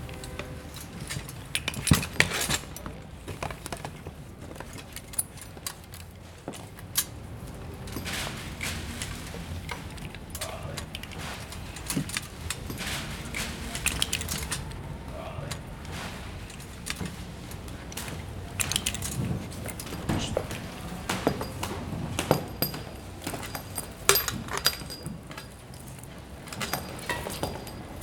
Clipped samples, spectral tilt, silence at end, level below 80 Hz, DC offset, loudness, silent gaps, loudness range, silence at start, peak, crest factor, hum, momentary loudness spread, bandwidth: under 0.1%; -3 dB/octave; 0 s; -46 dBFS; under 0.1%; -32 LUFS; none; 8 LU; 0 s; -2 dBFS; 32 dB; none; 14 LU; 19.5 kHz